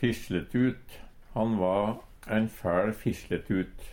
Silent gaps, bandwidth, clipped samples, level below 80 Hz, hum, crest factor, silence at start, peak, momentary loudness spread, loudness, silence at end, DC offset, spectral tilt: none; 18 kHz; under 0.1%; -50 dBFS; none; 18 dB; 0 s; -12 dBFS; 7 LU; -30 LUFS; 0 s; under 0.1%; -7 dB/octave